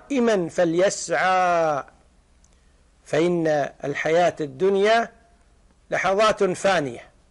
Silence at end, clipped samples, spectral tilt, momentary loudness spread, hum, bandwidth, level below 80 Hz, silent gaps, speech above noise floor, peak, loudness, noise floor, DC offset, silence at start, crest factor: 0.25 s; under 0.1%; -4.5 dB/octave; 8 LU; none; 11.5 kHz; -56 dBFS; none; 36 dB; -10 dBFS; -21 LUFS; -57 dBFS; under 0.1%; 0.1 s; 12 dB